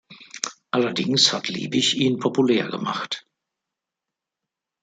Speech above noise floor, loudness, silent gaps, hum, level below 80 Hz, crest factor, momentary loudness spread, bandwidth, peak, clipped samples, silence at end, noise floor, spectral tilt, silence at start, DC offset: 64 dB; -22 LUFS; none; none; -68 dBFS; 22 dB; 13 LU; 9.4 kHz; -2 dBFS; under 0.1%; 1.65 s; -86 dBFS; -3.5 dB/octave; 0.1 s; under 0.1%